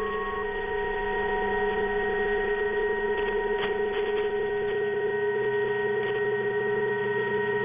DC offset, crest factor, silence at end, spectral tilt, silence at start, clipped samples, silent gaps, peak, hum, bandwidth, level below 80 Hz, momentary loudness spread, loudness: under 0.1%; 12 dB; 0 s; -3 dB/octave; 0 s; under 0.1%; none; -14 dBFS; none; 3.7 kHz; -48 dBFS; 2 LU; -27 LUFS